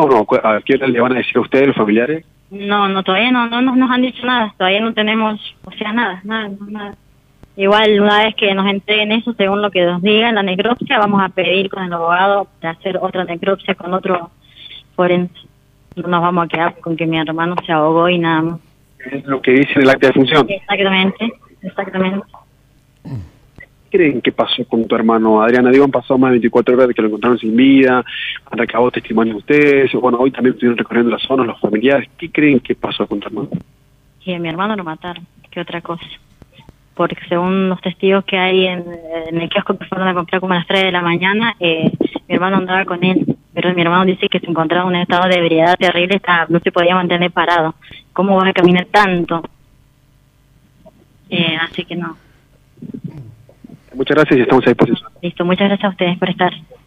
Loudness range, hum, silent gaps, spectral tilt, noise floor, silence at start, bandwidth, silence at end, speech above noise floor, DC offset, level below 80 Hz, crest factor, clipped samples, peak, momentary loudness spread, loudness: 7 LU; none; none; -7 dB/octave; -52 dBFS; 0 s; 9.2 kHz; 0.25 s; 37 dB; under 0.1%; -52 dBFS; 14 dB; under 0.1%; -2 dBFS; 14 LU; -14 LUFS